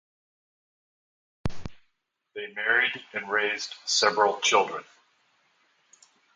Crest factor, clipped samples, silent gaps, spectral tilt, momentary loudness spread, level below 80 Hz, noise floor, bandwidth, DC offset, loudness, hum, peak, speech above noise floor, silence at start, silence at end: 24 dB; under 0.1%; none; -1.5 dB/octave; 17 LU; -54 dBFS; -76 dBFS; 10 kHz; under 0.1%; -25 LUFS; none; -6 dBFS; 50 dB; 1.45 s; 1.55 s